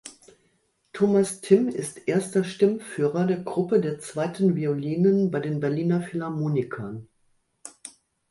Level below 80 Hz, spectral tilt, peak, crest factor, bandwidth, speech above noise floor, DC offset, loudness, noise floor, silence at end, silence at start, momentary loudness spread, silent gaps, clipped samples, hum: -66 dBFS; -7 dB/octave; -4 dBFS; 20 dB; 11.5 kHz; 45 dB; under 0.1%; -25 LUFS; -68 dBFS; 0.4 s; 0.05 s; 20 LU; none; under 0.1%; none